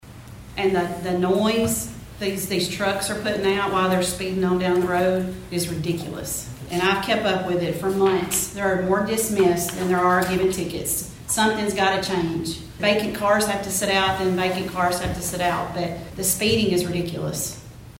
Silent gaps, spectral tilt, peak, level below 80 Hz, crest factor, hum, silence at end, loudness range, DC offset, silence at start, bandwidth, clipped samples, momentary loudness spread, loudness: none; -4 dB/octave; -6 dBFS; -46 dBFS; 18 dB; none; 0 s; 2 LU; under 0.1%; 0.05 s; 16.5 kHz; under 0.1%; 8 LU; -22 LUFS